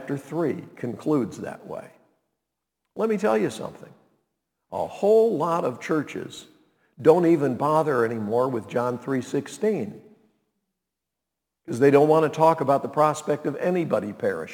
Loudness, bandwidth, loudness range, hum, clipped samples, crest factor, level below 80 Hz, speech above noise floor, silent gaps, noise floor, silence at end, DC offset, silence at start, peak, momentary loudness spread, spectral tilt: -23 LUFS; 18 kHz; 8 LU; none; under 0.1%; 22 dB; -72 dBFS; 62 dB; none; -85 dBFS; 0 s; under 0.1%; 0 s; -4 dBFS; 17 LU; -7 dB/octave